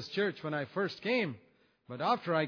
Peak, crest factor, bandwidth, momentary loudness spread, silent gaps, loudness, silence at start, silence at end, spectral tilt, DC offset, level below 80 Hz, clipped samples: -16 dBFS; 18 dB; 5.4 kHz; 9 LU; none; -34 LUFS; 0 s; 0 s; -6.5 dB/octave; under 0.1%; -80 dBFS; under 0.1%